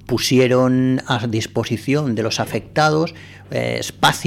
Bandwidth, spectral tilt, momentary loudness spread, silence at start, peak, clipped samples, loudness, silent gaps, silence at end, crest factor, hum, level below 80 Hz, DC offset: 16.5 kHz; -5 dB/octave; 8 LU; 0.05 s; -4 dBFS; under 0.1%; -18 LUFS; none; 0 s; 14 dB; none; -50 dBFS; under 0.1%